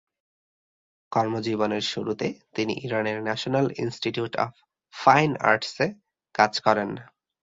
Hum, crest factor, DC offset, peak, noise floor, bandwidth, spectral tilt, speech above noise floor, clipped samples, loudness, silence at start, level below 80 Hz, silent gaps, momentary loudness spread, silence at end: none; 24 dB; under 0.1%; -2 dBFS; under -90 dBFS; 7.8 kHz; -5 dB/octave; over 65 dB; under 0.1%; -25 LUFS; 1.1 s; -66 dBFS; none; 10 LU; 0.5 s